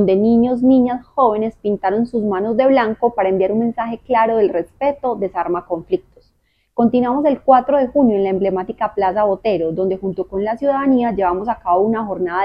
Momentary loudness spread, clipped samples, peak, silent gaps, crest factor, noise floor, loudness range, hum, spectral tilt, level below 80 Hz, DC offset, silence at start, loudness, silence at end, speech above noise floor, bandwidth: 8 LU; under 0.1%; 0 dBFS; none; 16 dB; -62 dBFS; 3 LU; none; -9.5 dB/octave; -48 dBFS; under 0.1%; 0 s; -17 LUFS; 0 s; 46 dB; 5.4 kHz